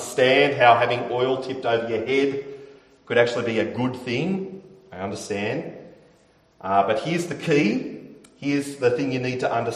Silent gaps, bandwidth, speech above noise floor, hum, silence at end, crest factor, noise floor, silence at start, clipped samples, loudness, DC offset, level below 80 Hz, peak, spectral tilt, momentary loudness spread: none; 13.5 kHz; 36 dB; none; 0 s; 22 dB; -58 dBFS; 0 s; under 0.1%; -22 LUFS; under 0.1%; -64 dBFS; -2 dBFS; -5.5 dB/octave; 18 LU